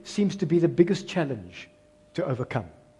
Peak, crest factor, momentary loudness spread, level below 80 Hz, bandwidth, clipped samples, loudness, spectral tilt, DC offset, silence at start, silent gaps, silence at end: -6 dBFS; 22 dB; 15 LU; -64 dBFS; 10.5 kHz; under 0.1%; -26 LUFS; -7 dB/octave; under 0.1%; 0.05 s; none; 0.3 s